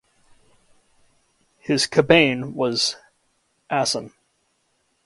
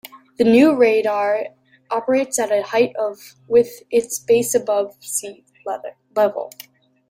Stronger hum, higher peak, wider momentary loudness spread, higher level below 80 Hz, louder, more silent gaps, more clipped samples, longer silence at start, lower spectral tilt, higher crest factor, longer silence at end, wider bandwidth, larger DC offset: neither; about the same, 0 dBFS vs -2 dBFS; first, 19 LU vs 16 LU; about the same, -60 dBFS vs -64 dBFS; about the same, -20 LUFS vs -19 LUFS; neither; neither; first, 1.7 s vs 0.15 s; about the same, -3.5 dB/octave vs -4 dB/octave; first, 24 dB vs 16 dB; first, 0.95 s vs 0.6 s; second, 11.5 kHz vs 16 kHz; neither